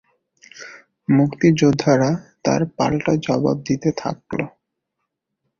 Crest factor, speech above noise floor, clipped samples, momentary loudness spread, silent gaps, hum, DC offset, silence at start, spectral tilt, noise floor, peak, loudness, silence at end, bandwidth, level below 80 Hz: 18 dB; 60 dB; under 0.1%; 17 LU; none; none; under 0.1%; 0.55 s; -6.5 dB/octave; -78 dBFS; -2 dBFS; -19 LUFS; 1.1 s; 7.2 kHz; -52 dBFS